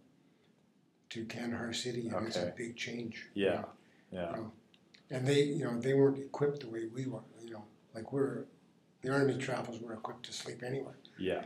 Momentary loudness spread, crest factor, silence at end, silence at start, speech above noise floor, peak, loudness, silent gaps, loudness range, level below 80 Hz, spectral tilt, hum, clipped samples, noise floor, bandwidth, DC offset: 17 LU; 20 dB; 0 s; 1.1 s; 34 dB; -16 dBFS; -36 LUFS; none; 5 LU; -78 dBFS; -5.5 dB/octave; none; under 0.1%; -70 dBFS; 12.5 kHz; under 0.1%